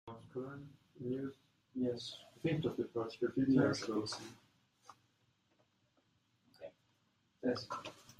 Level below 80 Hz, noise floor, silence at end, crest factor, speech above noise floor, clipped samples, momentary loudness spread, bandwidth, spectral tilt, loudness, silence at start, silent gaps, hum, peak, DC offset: -74 dBFS; -77 dBFS; 0.1 s; 22 dB; 40 dB; under 0.1%; 22 LU; 12 kHz; -6 dB/octave; -39 LUFS; 0.05 s; none; none; -20 dBFS; under 0.1%